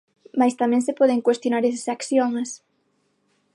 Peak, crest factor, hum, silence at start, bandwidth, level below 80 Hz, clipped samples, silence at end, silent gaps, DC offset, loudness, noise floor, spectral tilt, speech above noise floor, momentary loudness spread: -6 dBFS; 16 dB; 50 Hz at -70 dBFS; 0.35 s; 11.5 kHz; -78 dBFS; under 0.1%; 1 s; none; under 0.1%; -22 LUFS; -68 dBFS; -4 dB/octave; 47 dB; 10 LU